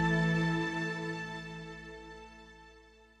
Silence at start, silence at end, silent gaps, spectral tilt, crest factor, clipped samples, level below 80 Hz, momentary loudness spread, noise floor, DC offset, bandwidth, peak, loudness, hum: 0 s; 0.35 s; none; -6 dB/octave; 16 dB; under 0.1%; -56 dBFS; 23 LU; -59 dBFS; under 0.1%; 9 kHz; -20 dBFS; -34 LUFS; none